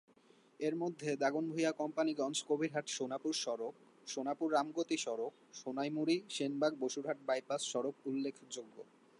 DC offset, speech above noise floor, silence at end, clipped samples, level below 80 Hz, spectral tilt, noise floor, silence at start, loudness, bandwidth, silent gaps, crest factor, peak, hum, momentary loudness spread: under 0.1%; 29 dB; 0.35 s; under 0.1%; under -90 dBFS; -4 dB/octave; -67 dBFS; 0.6 s; -38 LUFS; 11.5 kHz; none; 18 dB; -20 dBFS; none; 10 LU